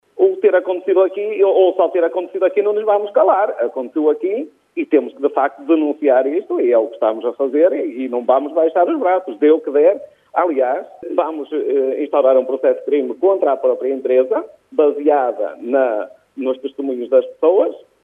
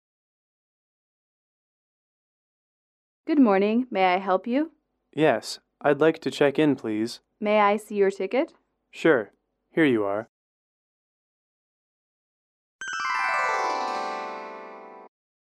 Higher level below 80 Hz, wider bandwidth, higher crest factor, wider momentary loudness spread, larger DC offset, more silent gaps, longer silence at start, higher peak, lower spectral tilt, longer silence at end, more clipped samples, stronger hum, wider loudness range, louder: about the same, -78 dBFS vs -76 dBFS; second, 3.7 kHz vs 13.5 kHz; second, 14 dB vs 20 dB; second, 8 LU vs 15 LU; neither; second, none vs 10.29-12.79 s; second, 0.15 s vs 3.25 s; first, -2 dBFS vs -8 dBFS; about the same, -6.5 dB/octave vs -5.5 dB/octave; second, 0.25 s vs 0.45 s; neither; neither; second, 2 LU vs 6 LU; first, -17 LUFS vs -24 LUFS